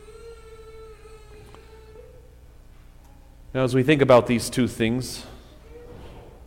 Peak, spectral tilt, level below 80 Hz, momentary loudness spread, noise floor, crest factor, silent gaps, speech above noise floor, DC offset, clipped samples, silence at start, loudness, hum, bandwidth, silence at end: -4 dBFS; -5.5 dB/octave; -46 dBFS; 28 LU; -48 dBFS; 22 dB; none; 28 dB; under 0.1%; under 0.1%; 0.1 s; -21 LUFS; none; 16.5 kHz; 0 s